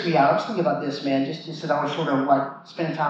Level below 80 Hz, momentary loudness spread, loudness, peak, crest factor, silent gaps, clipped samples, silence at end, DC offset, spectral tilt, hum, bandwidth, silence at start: -86 dBFS; 10 LU; -24 LUFS; -6 dBFS; 16 dB; none; under 0.1%; 0 s; under 0.1%; -7 dB/octave; none; 7.8 kHz; 0 s